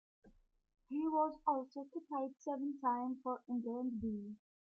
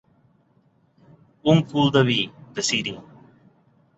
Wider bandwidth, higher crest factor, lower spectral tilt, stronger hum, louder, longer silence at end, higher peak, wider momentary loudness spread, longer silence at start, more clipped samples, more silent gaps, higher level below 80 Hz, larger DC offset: second, 6.8 kHz vs 8.4 kHz; about the same, 18 dB vs 22 dB; first, -8 dB/octave vs -5 dB/octave; neither; second, -40 LUFS vs -21 LUFS; second, 0.3 s vs 0.95 s; second, -22 dBFS vs -4 dBFS; about the same, 10 LU vs 11 LU; second, 0.25 s vs 1.45 s; neither; neither; second, -74 dBFS vs -60 dBFS; neither